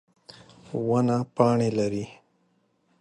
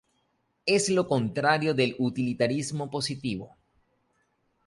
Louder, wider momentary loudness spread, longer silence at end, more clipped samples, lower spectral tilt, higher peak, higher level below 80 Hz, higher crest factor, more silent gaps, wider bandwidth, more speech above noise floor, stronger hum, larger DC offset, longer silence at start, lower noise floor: about the same, -25 LUFS vs -27 LUFS; first, 13 LU vs 9 LU; second, 0.9 s vs 1.2 s; neither; first, -7.5 dB/octave vs -4.5 dB/octave; about the same, -8 dBFS vs -8 dBFS; about the same, -62 dBFS vs -64 dBFS; about the same, 20 dB vs 20 dB; neither; about the same, 10.5 kHz vs 11.5 kHz; about the same, 45 dB vs 47 dB; neither; neither; about the same, 0.7 s vs 0.65 s; second, -69 dBFS vs -73 dBFS